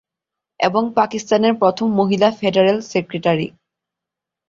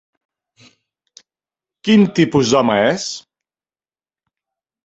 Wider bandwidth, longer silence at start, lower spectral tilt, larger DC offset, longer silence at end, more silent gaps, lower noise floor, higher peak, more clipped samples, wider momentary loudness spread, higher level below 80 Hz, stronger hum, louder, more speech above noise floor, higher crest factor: about the same, 7.6 kHz vs 8.2 kHz; second, 0.6 s vs 1.85 s; about the same, -5.5 dB/octave vs -5 dB/octave; neither; second, 1 s vs 1.65 s; neither; second, -85 dBFS vs under -90 dBFS; about the same, -2 dBFS vs -2 dBFS; neither; second, 6 LU vs 13 LU; about the same, -60 dBFS vs -56 dBFS; neither; about the same, -17 LUFS vs -15 LUFS; second, 68 dB vs over 76 dB; about the same, 16 dB vs 18 dB